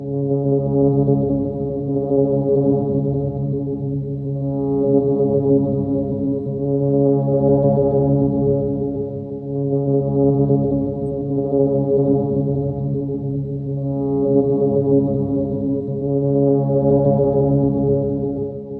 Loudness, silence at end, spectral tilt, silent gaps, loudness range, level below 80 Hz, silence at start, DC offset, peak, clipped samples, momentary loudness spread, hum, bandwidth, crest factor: -19 LUFS; 0 s; -14.5 dB/octave; none; 2 LU; -42 dBFS; 0 s; under 0.1%; -4 dBFS; under 0.1%; 7 LU; none; 1.5 kHz; 14 dB